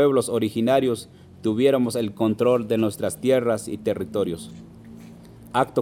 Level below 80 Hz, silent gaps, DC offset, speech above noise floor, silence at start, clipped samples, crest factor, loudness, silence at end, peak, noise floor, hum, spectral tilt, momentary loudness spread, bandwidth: -58 dBFS; none; under 0.1%; 22 dB; 0 s; under 0.1%; 16 dB; -23 LUFS; 0 s; -6 dBFS; -44 dBFS; none; -6 dB/octave; 20 LU; 17 kHz